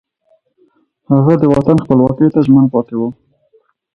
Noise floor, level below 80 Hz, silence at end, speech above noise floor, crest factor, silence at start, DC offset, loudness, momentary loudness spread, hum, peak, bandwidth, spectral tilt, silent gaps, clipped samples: -57 dBFS; -44 dBFS; 0.85 s; 47 dB; 14 dB; 1.1 s; under 0.1%; -12 LUFS; 9 LU; none; 0 dBFS; 6 kHz; -10.5 dB/octave; none; under 0.1%